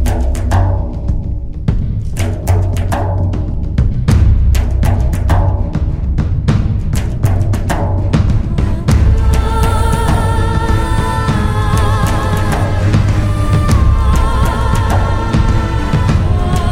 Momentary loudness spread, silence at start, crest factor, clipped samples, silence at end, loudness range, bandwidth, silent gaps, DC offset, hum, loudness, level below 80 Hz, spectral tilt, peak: 6 LU; 0 s; 12 dB; under 0.1%; 0 s; 2 LU; 16 kHz; none; under 0.1%; none; -14 LUFS; -16 dBFS; -7 dB/octave; 0 dBFS